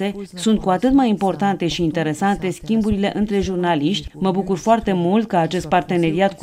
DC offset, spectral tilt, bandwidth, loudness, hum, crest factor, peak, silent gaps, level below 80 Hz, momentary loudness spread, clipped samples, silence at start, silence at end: under 0.1%; -6 dB/octave; 14.5 kHz; -19 LUFS; none; 14 dB; -4 dBFS; none; -40 dBFS; 5 LU; under 0.1%; 0 s; 0 s